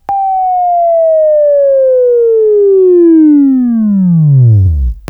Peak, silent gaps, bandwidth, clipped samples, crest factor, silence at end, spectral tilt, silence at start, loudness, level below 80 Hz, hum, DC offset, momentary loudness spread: 0 dBFS; none; 2.7 kHz; under 0.1%; 6 dB; 0.1 s; -13 dB/octave; 0.1 s; -7 LUFS; -24 dBFS; none; under 0.1%; 5 LU